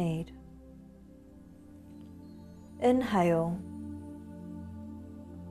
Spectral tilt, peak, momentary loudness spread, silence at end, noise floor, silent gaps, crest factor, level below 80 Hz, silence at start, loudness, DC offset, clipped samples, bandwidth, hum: -7.5 dB/octave; -16 dBFS; 26 LU; 0 s; -53 dBFS; none; 20 dB; -60 dBFS; 0 s; -31 LUFS; under 0.1%; under 0.1%; 13.5 kHz; none